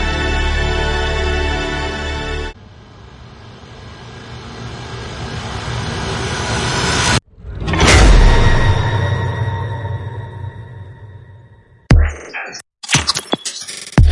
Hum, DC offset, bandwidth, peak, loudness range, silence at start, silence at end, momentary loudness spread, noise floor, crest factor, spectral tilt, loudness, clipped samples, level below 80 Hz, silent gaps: none; under 0.1%; 11.5 kHz; 0 dBFS; 13 LU; 0 s; 0 s; 21 LU; -45 dBFS; 16 dB; -4 dB/octave; -17 LUFS; under 0.1%; -20 dBFS; none